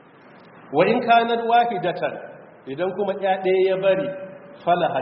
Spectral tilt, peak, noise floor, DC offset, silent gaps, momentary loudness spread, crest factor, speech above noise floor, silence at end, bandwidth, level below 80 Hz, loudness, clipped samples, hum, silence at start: -3.5 dB/octave; -4 dBFS; -48 dBFS; under 0.1%; none; 18 LU; 18 dB; 27 dB; 0 s; 5.6 kHz; -68 dBFS; -21 LUFS; under 0.1%; none; 0.55 s